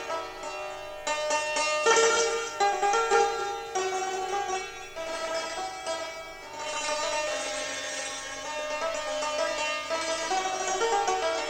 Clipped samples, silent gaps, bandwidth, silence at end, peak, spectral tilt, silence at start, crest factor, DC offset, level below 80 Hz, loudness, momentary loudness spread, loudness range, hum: under 0.1%; none; 17 kHz; 0 s; -8 dBFS; -0.5 dB/octave; 0 s; 22 dB; under 0.1%; -58 dBFS; -28 LUFS; 12 LU; 7 LU; 50 Hz at -65 dBFS